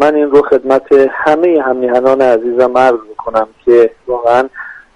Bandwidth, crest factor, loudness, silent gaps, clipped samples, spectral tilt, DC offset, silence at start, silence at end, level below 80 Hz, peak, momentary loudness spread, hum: 10 kHz; 10 dB; -11 LUFS; none; 0.1%; -6 dB/octave; under 0.1%; 0 s; 0.15 s; -48 dBFS; 0 dBFS; 7 LU; none